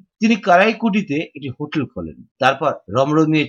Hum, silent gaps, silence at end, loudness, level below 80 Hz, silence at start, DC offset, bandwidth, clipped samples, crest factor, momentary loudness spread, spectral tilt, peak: none; 2.31-2.35 s; 0 s; -18 LUFS; -58 dBFS; 0.2 s; under 0.1%; 7.8 kHz; under 0.1%; 16 dB; 15 LU; -6 dB/octave; -2 dBFS